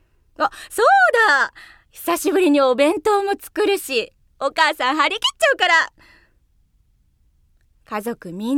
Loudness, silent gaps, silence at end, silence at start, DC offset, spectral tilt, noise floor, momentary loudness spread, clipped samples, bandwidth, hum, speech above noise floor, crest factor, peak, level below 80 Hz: -18 LUFS; none; 0 s; 0.4 s; under 0.1%; -2 dB/octave; -60 dBFS; 14 LU; under 0.1%; 18 kHz; none; 41 dB; 18 dB; -2 dBFS; -58 dBFS